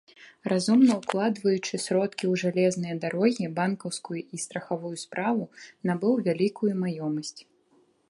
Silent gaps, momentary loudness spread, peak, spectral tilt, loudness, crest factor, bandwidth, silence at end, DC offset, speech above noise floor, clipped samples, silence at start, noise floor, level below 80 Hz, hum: none; 11 LU; -8 dBFS; -5.5 dB/octave; -27 LUFS; 20 dB; 11.5 kHz; 0.65 s; under 0.1%; 38 dB; under 0.1%; 0.2 s; -65 dBFS; -74 dBFS; none